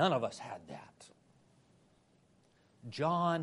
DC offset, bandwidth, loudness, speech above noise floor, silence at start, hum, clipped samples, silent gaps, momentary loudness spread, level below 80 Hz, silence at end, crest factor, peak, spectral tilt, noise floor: under 0.1%; 11.5 kHz; -36 LUFS; 34 dB; 0 s; none; under 0.1%; none; 26 LU; -80 dBFS; 0 s; 22 dB; -16 dBFS; -6 dB/octave; -69 dBFS